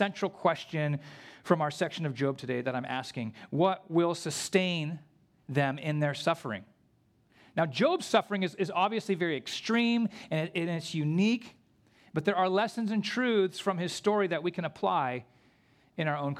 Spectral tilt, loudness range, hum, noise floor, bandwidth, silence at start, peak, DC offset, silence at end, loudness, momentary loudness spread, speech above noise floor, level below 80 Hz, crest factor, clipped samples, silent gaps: -5.5 dB/octave; 3 LU; none; -67 dBFS; 14.5 kHz; 0 s; -8 dBFS; under 0.1%; 0 s; -30 LUFS; 8 LU; 37 dB; -76 dBFS; 22 dB; under 0.1%; none